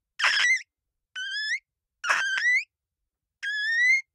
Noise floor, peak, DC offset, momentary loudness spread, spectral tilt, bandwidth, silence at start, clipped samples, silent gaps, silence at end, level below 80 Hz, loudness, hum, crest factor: -86 dBFS; -10 dBFS; under 0.1%; 15 LU; 4 dB/octave; 15 kHz; 0.2 s; under 0.1%; none; 0.15 s; -86 dBFS; -24 LUFS; none; 18 dB